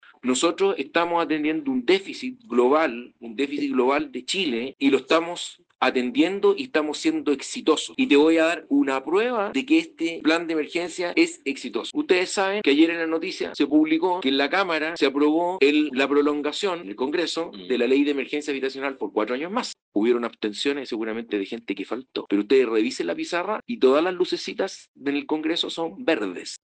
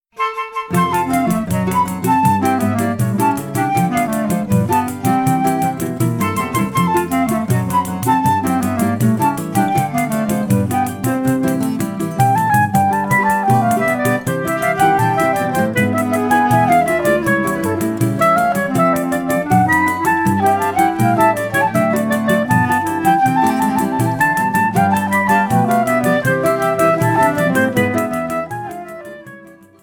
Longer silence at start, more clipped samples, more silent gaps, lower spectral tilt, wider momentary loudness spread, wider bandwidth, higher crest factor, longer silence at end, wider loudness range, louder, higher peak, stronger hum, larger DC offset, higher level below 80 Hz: about the same, 0.25 s vs 0.15 s; neither; first, 19.82-19.92 s, 24.88-24.94 s vs none; second, -3.5 dB/octave vs -6 dB/octave; first, 9 LU vs 5 LU; second, 9.4 kHz vs 19 kHz; first, 20 dB vs 14 dB; second, 0.05 s vs 0.3 s; about the same, 4 LU vs 2 LU; second, -23 LUFS vs -16 LUFS; about the same, -4 dBFS vs -2 dBFS; neither; neither; second, -70 dBFS vs -48 dBFS